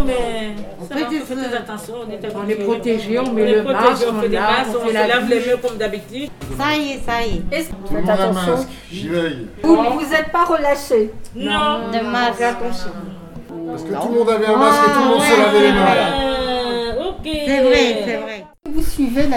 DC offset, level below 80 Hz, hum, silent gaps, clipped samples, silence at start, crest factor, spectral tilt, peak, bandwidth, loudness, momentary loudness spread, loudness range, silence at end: under 0.1%; -36 dBFS; none; none; under 0.1%; 0 s; 18 dB; -4.5 dB/octave; 0 dBFS; 17.5 kHz; -17 LUFS; 16 LU; 6 LU; 0 s